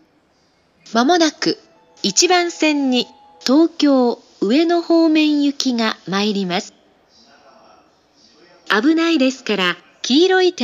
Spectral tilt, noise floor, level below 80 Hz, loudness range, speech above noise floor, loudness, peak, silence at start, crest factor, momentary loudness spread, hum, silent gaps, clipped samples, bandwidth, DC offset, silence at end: -3 dB/octave; -59 dBFS; -72 dBFS; 6 LU; 43 dB; -16 LUFS; 0 dBFS; 0.9 s; 16 dB; 9 LU; none; none; under 0.1%; 13 kHz; under 0.1%; 0 s